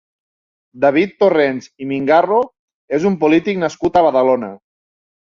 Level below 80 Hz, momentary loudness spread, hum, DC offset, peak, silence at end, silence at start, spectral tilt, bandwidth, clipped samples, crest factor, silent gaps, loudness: -54 dBFS; 10 LU; none; under 0.1%; -2 dBFS; 0.75 s; 0.75 s; -6.5 dB/octave; 7.4 kHz; under 0.1%; 14 dB; 2.59-2.68 s, 2.74-2.88 s; -15 LUFS